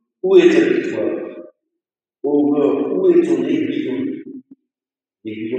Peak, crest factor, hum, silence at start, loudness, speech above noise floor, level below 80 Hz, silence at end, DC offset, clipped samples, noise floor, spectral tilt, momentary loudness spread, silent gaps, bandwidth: 0 dBFS; 18 dB; none; 0.25 s; -16 LUFS; over 75 dB; -78 dBFS; 0 s; under 0.1%; under 0.1%; under -90 dBFS; -6.5 dB/octave; 19 LU; none; 8.2 kHz